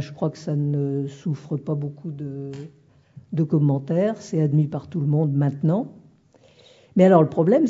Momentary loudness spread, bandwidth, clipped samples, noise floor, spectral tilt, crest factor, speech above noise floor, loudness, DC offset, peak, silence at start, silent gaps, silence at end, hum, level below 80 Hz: 15 LU; 7.6 kHz; under 0.1%; -55 dBFS; -9.5 dB/octave; 20 dB; 34 dB; -22 LUFS; under 0.1%; -2 dBFS; 0 s; none; 0 s; none; -66 dBFS